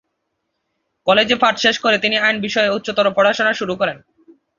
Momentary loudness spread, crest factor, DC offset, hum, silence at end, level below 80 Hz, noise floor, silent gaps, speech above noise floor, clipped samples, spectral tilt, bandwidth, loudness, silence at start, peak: 7 LU; 16 dB; under 0.1%; none; 0.6 s; -58 dBFS; -73 dBFS; none; 57 dB; under 0.1%; -3.5 dB/octave; 7.4 kHz; -16 LUFS; 1.05 s; -2 dBFS